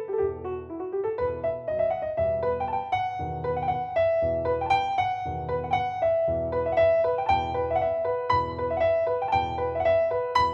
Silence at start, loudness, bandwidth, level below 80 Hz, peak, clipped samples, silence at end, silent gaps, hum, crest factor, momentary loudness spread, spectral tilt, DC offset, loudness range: 0 s; -26 LUFS; 7.4 kHz; -50 dBFS; -10 dBFS; under 0.1%; 0 s; none; none; 16 dB; 7 LU; -7 dB/octave; under 0.1%; 3 LU